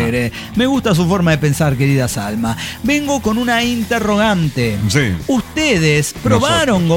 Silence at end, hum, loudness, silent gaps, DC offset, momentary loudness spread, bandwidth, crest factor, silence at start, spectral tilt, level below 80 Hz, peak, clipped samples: 0 s; none; -15 LUFS; none; under 0.1%; 6 LU; 17 kHz; 14 dB; 0 s; -5 dB/octave; -36 dBFS; -2 dBFS; under 0.1%